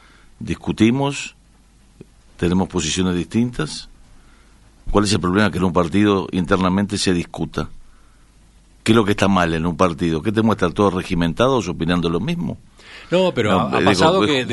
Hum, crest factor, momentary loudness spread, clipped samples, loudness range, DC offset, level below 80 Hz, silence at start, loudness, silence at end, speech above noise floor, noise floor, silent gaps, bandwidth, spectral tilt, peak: none; 18 dB; 11 LU; under 0.1%; 4 LU; under 0.1%; -38 dBFS; 0.4 s; -19 LUFS; 0 s; 33 dB; -51 dBFS; none; 11.5 kHz; -5.5 dB/octave; 0 dBFS